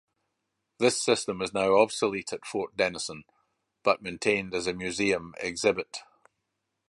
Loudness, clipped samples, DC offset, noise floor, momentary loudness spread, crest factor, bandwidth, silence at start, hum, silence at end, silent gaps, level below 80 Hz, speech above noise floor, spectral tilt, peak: -28 LUFS; under 0.1%; under 0.1%; -81 dBFS; 11 LU; 22 dB; 11.5 kHz; 0.8 s; none; 0.9 s; none; -62 dBFS; 54 dB; -3.5 dB/octave; -6 dBFS